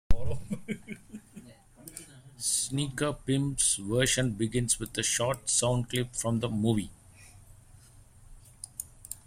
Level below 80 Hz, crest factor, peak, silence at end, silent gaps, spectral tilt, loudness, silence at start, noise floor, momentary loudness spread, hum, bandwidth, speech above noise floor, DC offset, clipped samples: -44 dBFS; 20 dB; -10 dBFS; 0.1 s; none; -3.5 dB/octave; -29 LUFS; 0.1 s; -55 dBFS; 19 LU; none; 16 kHz; 26 dB; under 0.1%; under 0.1%